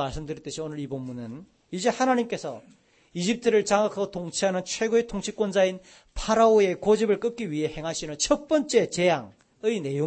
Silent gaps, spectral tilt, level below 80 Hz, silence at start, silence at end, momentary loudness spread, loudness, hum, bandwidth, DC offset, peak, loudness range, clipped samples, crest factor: none; -4.5 dB/octave; -50 dBFS; 0 s; 0 s; 14 LU; -25 LUFS; none; 8.8 kHz; under 0.1%; -6 dBFS; 4 LU; under 0.1%; 18 dB